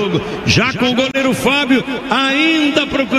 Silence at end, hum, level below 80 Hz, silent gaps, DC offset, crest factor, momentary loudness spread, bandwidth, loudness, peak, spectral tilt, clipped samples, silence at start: 0 s; none; -42 dBFS; none; under 0.1%; 14 dB; 4 LU; 14.5 kHz; -14 LUFS; 0 dBFS; -4.5 dB/octave; under 0.1%; 0 s